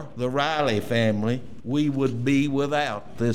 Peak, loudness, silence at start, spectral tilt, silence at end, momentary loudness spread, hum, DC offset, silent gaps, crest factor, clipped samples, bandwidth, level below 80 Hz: -10 dBFS; -24 LUFS; 0 s; -6.5 dB/octave; 0 s; 6 LU; none; 1%; none; 14 dB; under 0.1%; 15 kHz; -56 dBFS